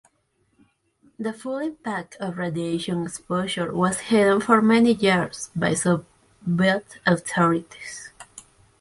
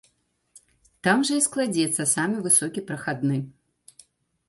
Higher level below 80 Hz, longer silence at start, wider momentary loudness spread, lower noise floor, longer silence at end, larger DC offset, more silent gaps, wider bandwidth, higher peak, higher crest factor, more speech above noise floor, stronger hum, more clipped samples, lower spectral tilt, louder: first, -60 dBFS vs -68 dBFS; first, 1.2 s vs 0.55 s; first, 16 LU vs 11 LU; about the same, -68 dBFS vs -69 dBFS; second, 0.4 s vs 1 s; neither; neither; about the same, 11.5 kHz vs 12 kHz; about the same, -4 dBFS vs -6 dBFS; about the same, 20 dB vs 20 dB; about the same, 46 dB vs 45 dB; neither; neither; first, -5 dB/octave vs -3.5 dB/octave; about the same, -23 LUFS vs -23 LUFS